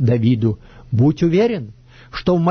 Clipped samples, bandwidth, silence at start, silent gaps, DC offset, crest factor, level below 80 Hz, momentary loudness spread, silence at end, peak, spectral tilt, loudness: under 0.1%; 6.4 kHz; 0 s; none; under 0.1%; 12 dB; -42 dBFS; 16 LU; 0 s; -4 dBFS; -9 dB/octave; -18 LUFS